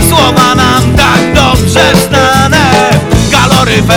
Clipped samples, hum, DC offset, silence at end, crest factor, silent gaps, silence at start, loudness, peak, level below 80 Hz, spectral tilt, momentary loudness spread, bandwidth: 8%; none; under 0.1%; 0 s; 6 dB; none; 0 s; -6 LUFS; 0 dBFS; -20 dBFS; -4.5 dB/octave; 1 LU; over 20 kHz